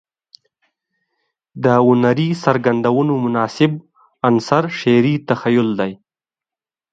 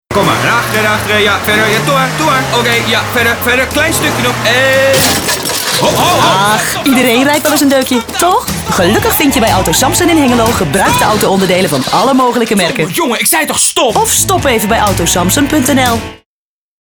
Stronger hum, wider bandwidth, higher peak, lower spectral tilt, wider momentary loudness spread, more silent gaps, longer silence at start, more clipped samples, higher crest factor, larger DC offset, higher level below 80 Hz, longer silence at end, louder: neither; second, 7.8 kHz vs over 20 kHz; about the same, 0 dBFS vs 0 dBFS; first, -7.5 dB/octave vs -3 dB/octave; first, 7 LU vs 3 LU; neither; first, 1.55 s vs 0.1 s; neither; first, 18 dB vs 10 dB; neither; second, -60 dBFS vs -32 dBFS; first, 0.95 s vs 0.65 s; second, -16 LUFS vs -9 LUFS